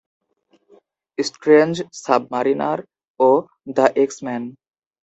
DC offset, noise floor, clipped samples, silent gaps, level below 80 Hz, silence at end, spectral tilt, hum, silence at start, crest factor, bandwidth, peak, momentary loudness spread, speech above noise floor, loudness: under 0.1%; -61 dBFS; under 0.1%; 3.10-3.14 s; -66 dBFS; 0.55 s; -5 dB/octave; none; 1.2 s; 20 dB; 8.2 kHz; 0 dBFS; 13 LU; 43 dB; -19 LUFS